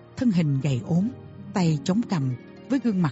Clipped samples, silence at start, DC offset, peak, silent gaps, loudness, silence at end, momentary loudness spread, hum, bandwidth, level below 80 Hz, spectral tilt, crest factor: under 0.1%; 0.15 s; under 0.1%; -10 dBFS; none; -25 LUFS; 0 s; 8 LU; none; 8 kHz; -58 dBFS; -7.5 dB/octave; 14 dB